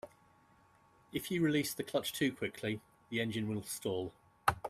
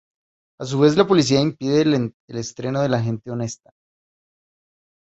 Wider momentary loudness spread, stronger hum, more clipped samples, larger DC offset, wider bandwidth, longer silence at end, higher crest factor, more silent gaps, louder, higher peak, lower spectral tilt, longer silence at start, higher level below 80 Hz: second, 10 LU vs 14 LU; neither; neither; neither; first, 15.5 kHz vs 8.2 kHz; second, 0 s vs 1.5 s; first, 26 dB vs 20 dB; second, none vs 2.14-2.28 s; second, -37 LUFS vs -20 LUFS; second, -12 dBFS vs -2 dBFS; second, -4.5 dB/octave vs -6 dB/octave; second, 0.05 s vs 0.6 s; second, -66 dBFS vs -56 dBFS